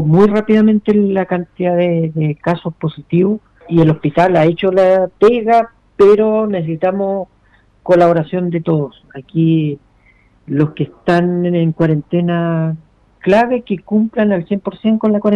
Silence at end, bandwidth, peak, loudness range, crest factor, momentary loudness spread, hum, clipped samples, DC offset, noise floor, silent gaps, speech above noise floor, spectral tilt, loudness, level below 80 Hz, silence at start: 0 s; 7.2 kHz; -2 dBFS; 4 LU; 12 dB; 10 LU; none; under 0.1%; under 0.1%; -51 dBFS; none; 38 dB; -9 dB/octave; -14 LUFS; -50 dBFS; 0 s